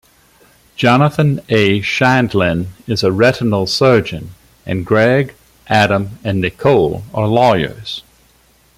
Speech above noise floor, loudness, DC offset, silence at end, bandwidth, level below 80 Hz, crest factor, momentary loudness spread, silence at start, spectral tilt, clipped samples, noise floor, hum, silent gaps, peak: 38 dB; -14 LUFS; under 0.1%; 0.75 s; 16 kHz; -46 dBFS; 14 dB; 12 LU; 0.8 s; -6 dB/octave; under 0.1%; -52 dBFS; none; none; 0 dBFS